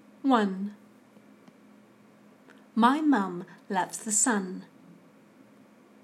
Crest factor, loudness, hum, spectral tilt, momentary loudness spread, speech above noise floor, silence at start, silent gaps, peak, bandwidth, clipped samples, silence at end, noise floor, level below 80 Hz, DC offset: 24 dB; -27 LUFS; none; -3.5 dB/octave; 16 LU; 30 dB; 0.25 s; none; -8 dBFS; 14 kHz; under 0.1%; 1.4 s; -56 dBFS; -90 dBFS; under 0.1%